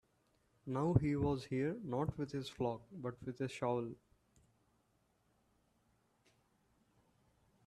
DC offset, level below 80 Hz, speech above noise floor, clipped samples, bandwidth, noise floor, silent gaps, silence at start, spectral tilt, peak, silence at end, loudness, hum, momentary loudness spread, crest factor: under 0.1%; -64 dBFS; 39 dB; under 0.1%; 12.5 kHz; -78 dBFS; none; 0.65 s; -8 dB/octave; -16 dBFS; 3.7 s; -39 LUFS; none; 12 LU; 26 dB